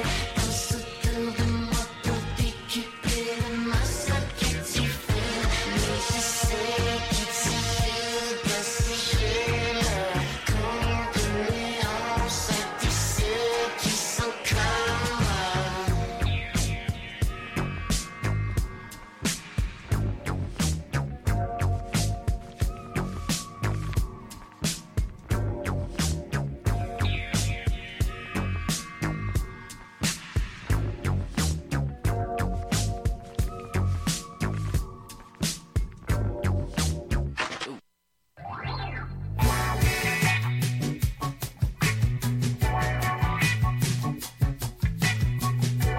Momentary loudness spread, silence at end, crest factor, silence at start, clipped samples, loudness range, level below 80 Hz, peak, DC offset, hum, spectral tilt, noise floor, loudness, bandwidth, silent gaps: 7 LU; 0 s; 16 dB; 0 s; under 0.1%; 5 LU; -34 dBFS; -12 dBFS; under 0.1%; none; -4.5 dB/octave; -72 dBFS; -28 LUFS; 16.5 kHz; none